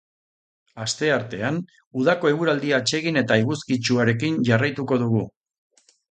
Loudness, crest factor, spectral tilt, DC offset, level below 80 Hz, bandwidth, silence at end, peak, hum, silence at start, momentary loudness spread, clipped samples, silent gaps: -22 LUFS; 20 dB; -5 dB/octave; under 0.1%; -60 dBFS; 9.4 kHz; 0.8 s; -2 dBFS; none; 0.75 s; 7 LU; under 0.1%; 1.87-1.91 s